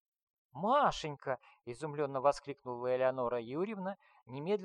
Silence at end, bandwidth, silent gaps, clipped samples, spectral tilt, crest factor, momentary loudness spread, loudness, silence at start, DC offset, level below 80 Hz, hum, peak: 0 s; 11 kHz; none; under 0.1%; -5.5 dB/octave; 20 dB; 14 LU; -36 LUFS; 0.55 s; under 0.1%; -66 dBFS; none; -16 dBFS